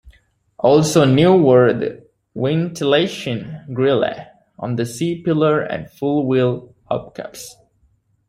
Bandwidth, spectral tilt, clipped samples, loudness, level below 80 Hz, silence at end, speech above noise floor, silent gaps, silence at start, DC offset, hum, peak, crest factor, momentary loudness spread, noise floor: 15.5 kHz; -6 dB/octave; under 0.1%; -17 LUFS; -54 dBFS; 0.75 s; 44 dB; none; 0.05 s; under 0.1%; none; -2 dBFS; 16 dB; 18 LU; -60 dBFS